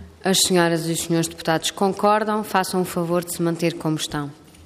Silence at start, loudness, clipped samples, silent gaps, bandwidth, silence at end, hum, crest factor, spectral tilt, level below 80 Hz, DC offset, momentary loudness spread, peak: 0 s; -21 LUFS; under 0.1%; none; 15.5 kHz; 0 s; none; 16 dB; -4 dB/octave; -56 dBFS; under 0.1%; 7 LU; -6 dBFS